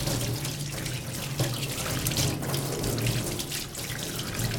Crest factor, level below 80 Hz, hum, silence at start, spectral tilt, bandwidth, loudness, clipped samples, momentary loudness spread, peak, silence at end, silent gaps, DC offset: 24 dB; -46 dBFS; none; 0 s; -4 dB/octave; over 20 kHz; -30 LUFS; under 0.1%; 5 LU; -6 dBFS; 0 s; none; under 0.1%